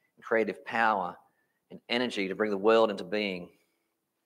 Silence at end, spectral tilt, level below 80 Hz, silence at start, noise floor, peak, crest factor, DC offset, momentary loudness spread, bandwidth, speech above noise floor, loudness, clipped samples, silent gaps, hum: 0.8 s; -5 dB/octave; -80 dBFS; 0.25 s; -80 dBFS; -12 dBFS; 20 dB; under 0.1%; 9 LU; 11 kHz; 51 dB; -29 LUFS; under 0.1%; none; none